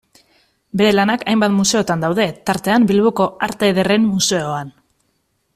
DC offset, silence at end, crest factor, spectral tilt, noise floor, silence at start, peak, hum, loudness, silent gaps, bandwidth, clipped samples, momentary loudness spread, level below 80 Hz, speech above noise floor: under 0.1%; 0.85 s; 14 dB; -4.5 dB/octave; -66 dBFS; 0.75 s; -2 dBFS; none; -16 LUFS; none; 14.5 kHz; under 0.1%; 7 LU; -52 dBFS; 50 dB